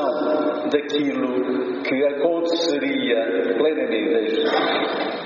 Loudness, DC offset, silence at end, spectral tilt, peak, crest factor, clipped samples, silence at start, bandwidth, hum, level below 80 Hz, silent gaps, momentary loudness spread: -21 LUFS; under 0.1%; 0 s; -2 dB/octave; -6 dBFS; 14 dB; under 0.1%; 0 s; 7.2 kHz; none; -70 dBFS; none; 3 LU